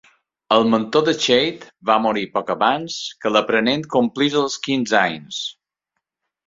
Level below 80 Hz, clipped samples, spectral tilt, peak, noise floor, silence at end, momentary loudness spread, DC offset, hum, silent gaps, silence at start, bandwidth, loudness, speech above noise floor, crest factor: -62 dBFS; under 0.1%; -4 dB/octave; -2 dBFS; -79 dBFS; 0.95 s; 10 LU; under 0.1%; none; none; 0.5 s; 7.8 kHz; -19 LUFS; 60 dB; 18 dB